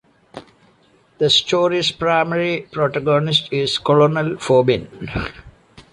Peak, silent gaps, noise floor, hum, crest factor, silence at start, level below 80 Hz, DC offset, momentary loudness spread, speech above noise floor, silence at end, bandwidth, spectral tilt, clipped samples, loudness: -2 dBFS; none; -55 dBFS; none; 16 dB; 0.35 s; -46 dBFS; under 0.1%; 11 LU; 38 dB; 0.1 s; 11 kHz; -5 dB/octave; under 0.1%; -17 LUFS